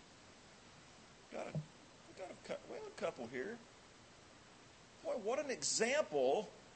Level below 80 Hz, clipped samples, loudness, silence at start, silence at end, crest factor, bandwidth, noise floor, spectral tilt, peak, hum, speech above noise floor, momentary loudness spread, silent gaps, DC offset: -76 dBFS; under 0.1%; -41 LUFS; 0 s; 0 s; 20 dB; 8.4 kHz; -62 dBFS; -3 dB/octave; -22 dBFS; none; 23 dB; 25 LU; none; under 0.1%